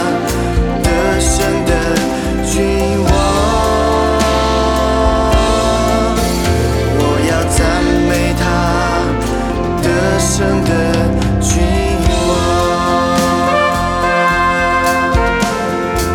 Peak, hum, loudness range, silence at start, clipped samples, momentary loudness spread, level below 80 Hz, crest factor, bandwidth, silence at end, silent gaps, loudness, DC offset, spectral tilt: 0 dBFS; none; 1 LU; 0 s; under 0.1%; 3 LU; -20 dBFS; 12 dB; 18.5 kHz; 0 s; none; -13 LUFS; under 0.1%; -5 dB/octave